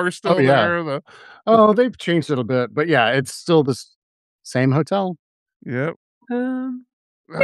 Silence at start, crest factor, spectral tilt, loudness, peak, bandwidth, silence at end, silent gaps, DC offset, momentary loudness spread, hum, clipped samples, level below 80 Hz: 0 s; 18 dB; -6 dB/octave; -19 LUFS; -2 dBFS; 12.5 kHz; 0 s; 3.96-4.39 s, 5.19-5.46 s, 5.56-5.60 s, 5.96-6.21 s, 6.93-7.24 s; under 0.1%; 14 LU; none; under 0.1%; -66 dBFS